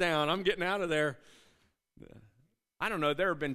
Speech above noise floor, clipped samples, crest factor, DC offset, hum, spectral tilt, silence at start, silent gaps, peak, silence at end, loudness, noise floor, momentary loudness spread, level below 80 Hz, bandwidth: 40 dB; under 0.1%; 18 dB; under 0.1%; none; -5 dB/octave; 0 s; none; -16 dBFS; 0 s; -31 LUFS; -72 dBFS; 7 LU; -62 dBFS; 15 kHz